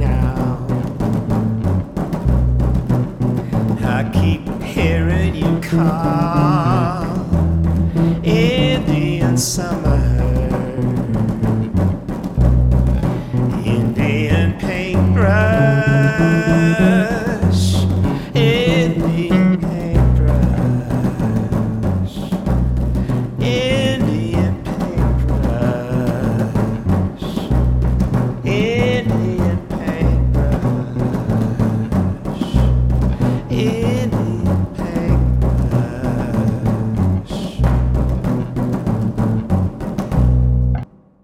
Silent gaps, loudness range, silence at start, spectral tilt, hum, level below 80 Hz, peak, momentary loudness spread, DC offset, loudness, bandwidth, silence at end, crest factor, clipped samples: none; 4 LU; 0 s; -7 dB/octave; none; -24 dBFS; 0 dBFS; 6 LU; under 0.1%; -17 LUFS; 15 kHz; 0.4 s; 16 dB; under 0.1%